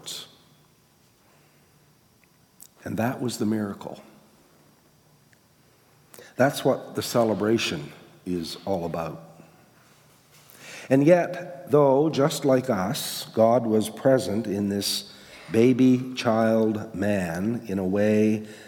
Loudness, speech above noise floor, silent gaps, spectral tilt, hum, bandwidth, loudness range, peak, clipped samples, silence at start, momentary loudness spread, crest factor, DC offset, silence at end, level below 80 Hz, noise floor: -24 LUFS; 37 dB; none; -5.5 dB/octave; none; 18 kHz; 10 LU; -6 dBFS; under 0.1%; 0.05 s; 18 LU; 20 dB; under 0.1%; 0 s; -70 dBFS; -60 dBFS